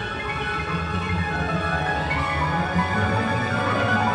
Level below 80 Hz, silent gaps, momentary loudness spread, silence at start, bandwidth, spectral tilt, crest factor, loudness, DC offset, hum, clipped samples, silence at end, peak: -38 dBFS; none; 4 LU; 0 s; 11 kHz; -6 dB/octave; 16 dB; -23 LUFS; under 0.1%; none; under 0.1%; 0 s; -8 dBFS